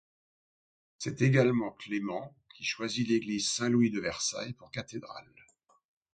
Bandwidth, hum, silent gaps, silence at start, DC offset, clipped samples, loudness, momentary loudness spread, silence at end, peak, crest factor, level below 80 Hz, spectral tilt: 9.2 kHz; none; none; 1 s; under 0.1%; under 0.1%; -31 LUFS; 15 LU; 0.95 s; -10 dBFS; 22 dB; -68 dBFS; -4.5 dB/octave